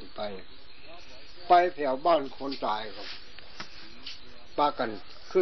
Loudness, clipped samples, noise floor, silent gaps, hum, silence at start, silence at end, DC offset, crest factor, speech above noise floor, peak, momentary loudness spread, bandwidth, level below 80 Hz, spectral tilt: -28 LUFS; under 0.1%; -50 dBFS; none; none; 0 s; 0 s; 1%; 22 dB; 22 dB; -8 dBFS; 25 LU; 6.2 kHz; -58 dBFS; -2 dB/octave